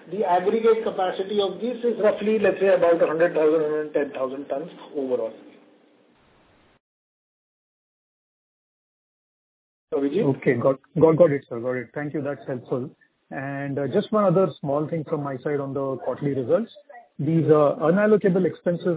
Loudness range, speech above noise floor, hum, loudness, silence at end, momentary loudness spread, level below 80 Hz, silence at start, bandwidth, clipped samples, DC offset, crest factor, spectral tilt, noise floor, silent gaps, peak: 11 LU; 36 dB; none; -23 LUFS; 0 s; 12 LU; -66 dBFS; 0.05 s; 4 kHz; under 0.1%; under 0.1%; 20 dB; -11 dB/octave; -59 dBFS; 6.80-9.88 s; -4 dBFS